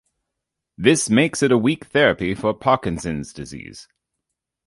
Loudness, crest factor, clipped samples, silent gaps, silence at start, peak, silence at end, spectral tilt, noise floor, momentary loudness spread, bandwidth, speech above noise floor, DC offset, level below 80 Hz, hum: -19 LUFS; 20 dB; under 0.1%; none; 0.8 s; -2 dBFS; 0.85 s; -4.5 dB/octave; -82 dBFS; 17 LU; 11.5 kHz; 62 dB; under 0.1%; -48 dBFS; none